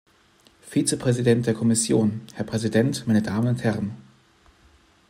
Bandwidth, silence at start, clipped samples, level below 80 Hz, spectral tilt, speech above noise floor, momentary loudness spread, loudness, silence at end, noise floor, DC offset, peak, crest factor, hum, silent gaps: 16 kHz; 0.65 s; under 0.1%; -58 dBFS; -5.5 dB/octave; 36 dB; 9 LU; -23 LUFS; 1.1 s; -58 dBFS; under 0.1%; -6 dBFS; 18 dB; none; none